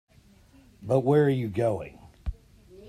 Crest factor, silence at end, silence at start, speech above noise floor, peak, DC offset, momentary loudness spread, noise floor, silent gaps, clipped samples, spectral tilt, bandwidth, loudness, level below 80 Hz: 18 dB; 0 s; 0.8 s; 33 dB; -10 dBFS; under 0.1%; 19 LU; -57 dBFS; none; under 0.1%; -8.5 dB/octave; 13.5 kHz; -25 LUFS; -46 dBFS